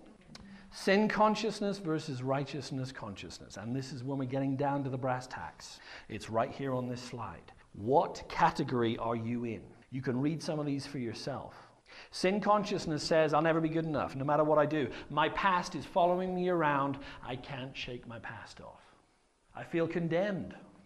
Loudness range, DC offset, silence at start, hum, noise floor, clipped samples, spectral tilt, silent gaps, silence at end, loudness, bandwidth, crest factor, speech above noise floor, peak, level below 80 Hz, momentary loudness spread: 7 LU; under 0.1%; 0 s; none; -69 dBFS; under 0.1%; -6 dB/octave; none; 0.15 s; -33 LUFS; 13 kHz; 20 dB; 36 dB; -12 dBFS; -60 dBFS; 17 LU